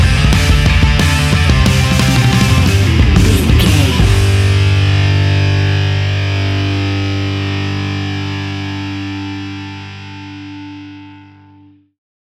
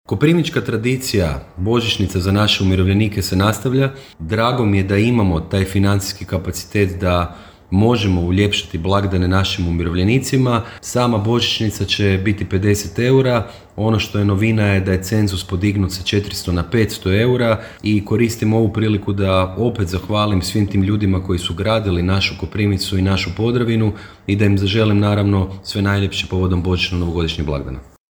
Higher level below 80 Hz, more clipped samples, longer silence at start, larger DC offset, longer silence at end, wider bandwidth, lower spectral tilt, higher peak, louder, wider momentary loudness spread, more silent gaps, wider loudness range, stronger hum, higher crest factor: first, -20 dBFS vs -36 dBFS; neither; about the same, 0 s vs 0.1 s; neither; first, 1.15 s vs 0.3 s; second, 14.5 kHz vs over 20 kHz; about the same, -5.5 dB/octave vs -6 dB/octave; about the same, 0 dBFS vs 0 dBFS; first, -13 LUFS vs -17 LUFS; first, 18 LU vs 6 LU; neither; first, 14 LU vs 1 LU; first, 50 Hz at -35 dBFS vs none; about the same, 12 dB vs 16 dB